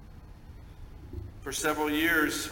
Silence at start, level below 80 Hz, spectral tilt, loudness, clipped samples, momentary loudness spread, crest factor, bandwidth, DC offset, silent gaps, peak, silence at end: 0 s; -48 dBFS; -3 dB/octave; -27 LUFS; under 0.1%; 25 LU; 18 dB; 17 kHz; under 0.1%; none; -14 dBFS; 0 s